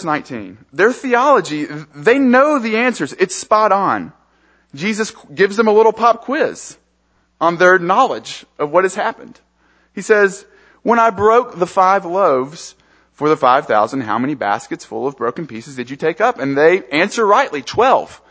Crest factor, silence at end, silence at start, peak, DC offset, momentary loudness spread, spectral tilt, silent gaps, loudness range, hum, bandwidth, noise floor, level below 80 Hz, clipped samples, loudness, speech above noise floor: 16 dB; 0.15 s; 0 s; 0 dBFS; under 0.1%; 15 LU; -4.5 dB/octave; none; 3 LU; none; 8 kHz; -61 dBFS; -58 dBFS; under 0.1%; -15 LUFS; 45 dB